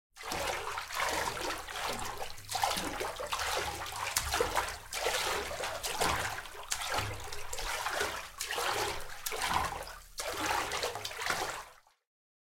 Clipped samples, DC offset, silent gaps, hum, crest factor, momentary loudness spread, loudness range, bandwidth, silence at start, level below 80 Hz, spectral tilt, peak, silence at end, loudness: under 0.1%; under 0.1%; none; none; 26 dB; 8 LU; 2 LU; 17 kHz; 0.15 s; -52 dBFS; -1.5 dB/octave; -10 dBFS; 0.7 s; -35 LUFS